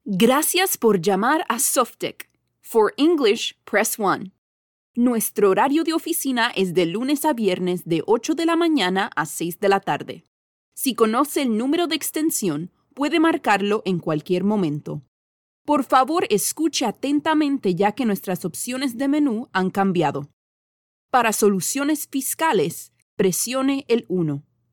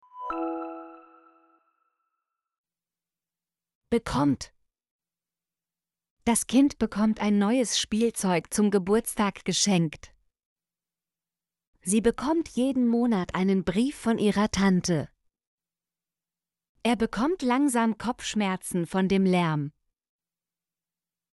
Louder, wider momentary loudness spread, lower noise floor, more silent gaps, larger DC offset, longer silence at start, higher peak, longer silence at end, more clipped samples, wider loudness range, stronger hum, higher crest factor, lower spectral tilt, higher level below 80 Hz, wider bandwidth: first, -21 LUFS vs -26 LUFS; about the same, 9 LU vs 9 LU; about the same, under -90 dBFS vs under -90 dBFS; first, 4.38-4.94 s, 10.27-10.72 s, 15.08-15.65 s, 20.33-21.09 s, 23.02-23.17 s vs 2.58-2.64 s, 3.75-3.81 s, 4.91-4.99 s, 6.10-6.17 s, 10.45-10.56 s, 11.67-11.73 s, 15.47-15.58 s, 16.69-16.75 s; neither; about the same, 0.05 s vs 0.15 s; first, -4 dBFS vs -10 dBFS; second, 0.3 s vs 1.65 s; neither; second, 2 LU vs 8 LU; neither; about the same, 18 dB vs 18 dB; about the same, -4 dB/octave vs -5 dB/octave; second, -68 dBFS vs -54 dBFS; first, 19 kHz vs 11.5 kHz